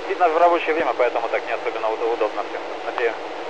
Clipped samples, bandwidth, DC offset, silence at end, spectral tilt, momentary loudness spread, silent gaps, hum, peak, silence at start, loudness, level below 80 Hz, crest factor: under 0.1%; 8.8 kHz; 1%; 0 s; -3.5 dB/octave; 11 LU; none; none; -6 dBFS; 0 s; -22 LUFS; -62 dBFS; 16 dB